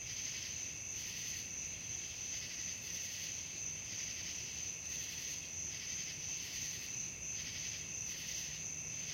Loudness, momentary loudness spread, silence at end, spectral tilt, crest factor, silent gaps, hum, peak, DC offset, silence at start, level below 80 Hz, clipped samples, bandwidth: -41 LUFS; 1 LU; 0 s; 0 dB/octave; 14 dB; none; none; -28 dBFS; under 0.1%; 0 s; -66 dBFS; under 0.1%; 16.5 kHz